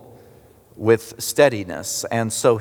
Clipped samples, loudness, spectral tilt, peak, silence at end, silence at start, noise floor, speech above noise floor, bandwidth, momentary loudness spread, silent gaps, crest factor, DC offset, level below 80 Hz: under 0.1%; -20 LUFS; -4 dB/octave; -2 dBFS; 0 s; 0.1 s; -49 dBFS; 30 dB; over 20 kHz; 8 LU; none; 20 dB; under 0.1%; -60 dBFS